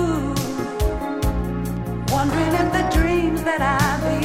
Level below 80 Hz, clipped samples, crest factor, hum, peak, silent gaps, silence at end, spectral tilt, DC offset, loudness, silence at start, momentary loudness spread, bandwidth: -28 dBFS; under 0.1%; 16 dB; none; -4 dBFS; none; 0 s; -6 dB/octave; under 0.1%; -21 LUFS; 0 s; 7 LU; 16.5 kHz